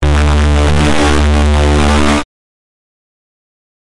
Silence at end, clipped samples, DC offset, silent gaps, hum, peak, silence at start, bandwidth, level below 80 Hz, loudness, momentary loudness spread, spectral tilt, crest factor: 1.75 s; under 0.1%; 8%; none; none; -4 dBFS; 0 s; 11.5 kHz; -16 dBFS; -11 LUFS; 3 LU; -5.5 dB/octave; 8 dB